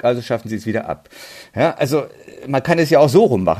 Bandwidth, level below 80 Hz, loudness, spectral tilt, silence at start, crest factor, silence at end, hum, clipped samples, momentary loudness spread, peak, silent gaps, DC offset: 14.5 kHz; -54 dBFS; -17 LUFS; -6.5 dB/octave; 0.05 s; 16 dB; 0 s; none; under 0.1%; 21 LU; -2 dBFS; none; under 0.1%